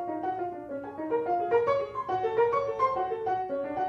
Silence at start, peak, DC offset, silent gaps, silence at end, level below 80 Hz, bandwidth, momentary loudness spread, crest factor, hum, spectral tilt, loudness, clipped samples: 0 s; -14 dBFS; under 0.1%; none; 0 s; -64 dBFS; 6.6 kHz; 9 LU; 14 dB; none; -7 dB/octave; -29 LUFS; under 0.1%